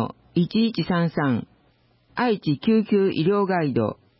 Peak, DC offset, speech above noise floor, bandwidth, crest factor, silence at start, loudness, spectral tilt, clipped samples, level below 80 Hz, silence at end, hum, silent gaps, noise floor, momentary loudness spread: -10 dBFS; under 0.1%; 40 dB; 5.8 kHz; 12 dB; 0 s; -22 LUFS; -11.5 dB/octave; under 0.1%; -58 dBFS; 0.25 s; none; none; -61 dBFS; 6 LU